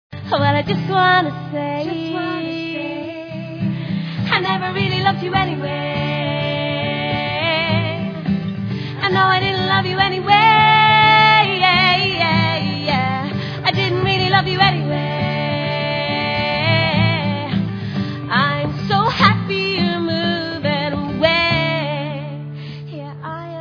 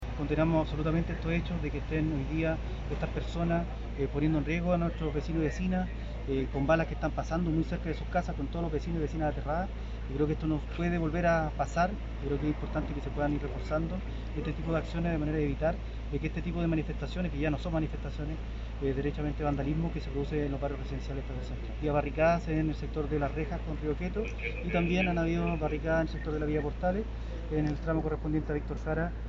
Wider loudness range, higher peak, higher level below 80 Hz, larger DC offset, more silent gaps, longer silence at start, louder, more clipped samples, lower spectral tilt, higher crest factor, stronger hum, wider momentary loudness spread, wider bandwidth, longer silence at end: first, 8 LU vs 2 LU; first, 0 dBFS vs -14 dBFS; second, -46 dBFS vs -38 dBFS; neither; neither; about the same, 0.1 s vs 0 s; first, -17 LUFS vs -32 LUFS; neither; about the same, -7 dB/octave vs -6.5 dB/octave; about the same, 18 dB vs 18 dB; neither; first, 12 LU vs 8 LU; second, 5.4 kHz vs 7.6 kHz; about the same, 0 s vs 0 s